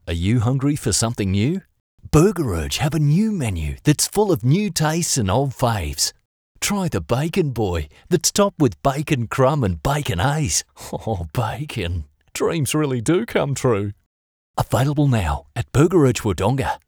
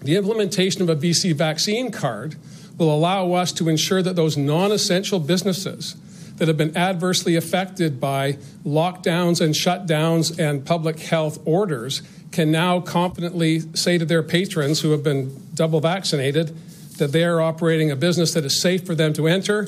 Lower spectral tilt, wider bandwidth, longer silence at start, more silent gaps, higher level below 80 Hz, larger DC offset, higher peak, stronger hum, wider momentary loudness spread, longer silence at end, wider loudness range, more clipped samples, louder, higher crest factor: about the same, -5 dB/octave vs -5 dB/octave; first, over 20 kHz vs 16 kHz; about the same, 0.05 s vs 0 s; first, 1.80-1.98 s, 6.25-6.55 s, 14.06-14.54 s vs none; first, -38 dBFS vs -64 dBFS; neither; first, 0 dBFS vs -6 dBFS; neither; about the same, 8 LU vs 7 LU; about the same, 0.1 s vs 0 s; about the same, 3 LU vs 2 LU; neither; about the same, -20 LUFS vs -20 LUFS; first, 20 dB vs 14 dB